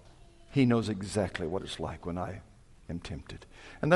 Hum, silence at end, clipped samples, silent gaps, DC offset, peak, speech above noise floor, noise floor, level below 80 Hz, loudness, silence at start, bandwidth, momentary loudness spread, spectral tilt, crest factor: none; 0 s; under 0.1%; none; under 0.1%; -10 dBFS; 24 dB; -55 dBFS; -54 dBFS; -33 LUFS; 0.05 s; 11.5 kHz; 21 LU; -6.5 dB/octave; 22 dB